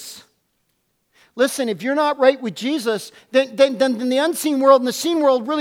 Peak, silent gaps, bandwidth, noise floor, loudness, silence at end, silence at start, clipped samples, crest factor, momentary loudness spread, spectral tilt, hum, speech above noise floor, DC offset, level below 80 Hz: 0 dBFS; none; 16.5 kHz; -69 dBFS; -18 LUFS; 0 s; 0 s; under 0.1%; 18 dB; 9 LU; -3.5 dB/octave; none; 51 dB; under 0.1%; -74 dBFS